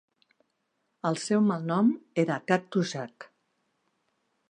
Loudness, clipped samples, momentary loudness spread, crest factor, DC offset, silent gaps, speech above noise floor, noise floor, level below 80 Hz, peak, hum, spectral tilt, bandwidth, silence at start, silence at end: -28 LUFS; under 0.1%; 8 LU; 22 dB; under 0.1%; none; 51 dB; -77 dBFS; -78 dBFS; -8 dBFS; none; -6 dB/octave; 10 kHz; 1.05 s; 1.25 s